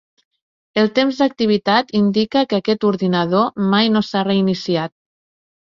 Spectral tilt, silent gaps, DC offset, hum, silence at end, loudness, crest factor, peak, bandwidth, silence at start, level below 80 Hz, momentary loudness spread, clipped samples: -6.5 dB/octave; none; under 0.1%; none; 0.7 s; -17 LUFS; 16 dB; -2 dBFS; 7.2 kHz; 0.75 s; -58 dBFS; 4 LU; under 0.1%